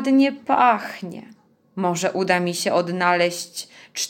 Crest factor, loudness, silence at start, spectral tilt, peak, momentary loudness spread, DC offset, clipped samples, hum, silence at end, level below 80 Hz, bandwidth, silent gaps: 18 dB; -20 LUFS; 0 s; -4 dB/octave; -4 dBFS; 16 LU; under 0.1%; under 0.1%; none; 0 s; -74 dBFS; 17 kHz; none